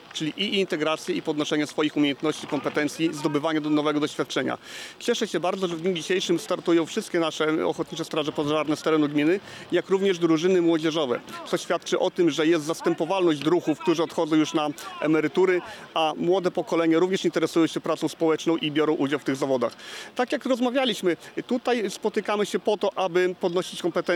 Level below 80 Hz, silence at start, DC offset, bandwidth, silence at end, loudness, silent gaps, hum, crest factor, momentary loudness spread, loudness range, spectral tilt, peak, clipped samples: -74 dBFS; 0.05 s; under 0.1%; 14.5 kHz; 0 s; -25 LUFS; none; none; 12 dB; 6 LU; 2 LU; -5 dB/octave; -12 dBFS; under 0.1%